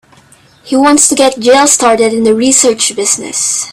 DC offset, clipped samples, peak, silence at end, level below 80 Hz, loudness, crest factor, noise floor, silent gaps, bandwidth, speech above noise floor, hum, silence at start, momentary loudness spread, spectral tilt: under 0.1%; 0.3%; 0 dBFS; 0 s; -50 dBFS; -8 LUFS; 10 dB; -43 dBFS; none; over 20 kHz; 34 dB; none; 0.65 s; 6 LU; -1.5 dB/octave